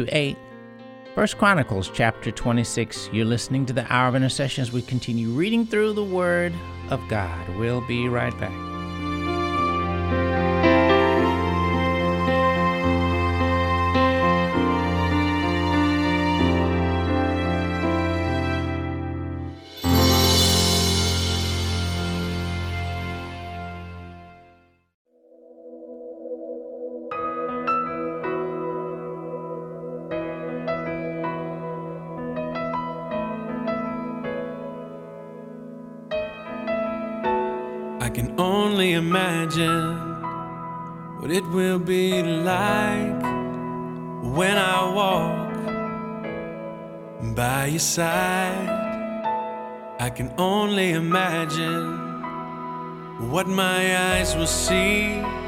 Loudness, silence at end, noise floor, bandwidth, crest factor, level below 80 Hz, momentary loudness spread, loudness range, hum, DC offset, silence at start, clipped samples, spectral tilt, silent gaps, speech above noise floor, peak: -23 LUFS; 0 s; -56 dBFS; 16 kHz; 20 dB; -42 dBFS; 14 LU; 10 LU; none; under 0.1%; 0 s; under 0.1%; -5 dB/octave; 24.94-25.05 s; 33 dB; -4 dBFS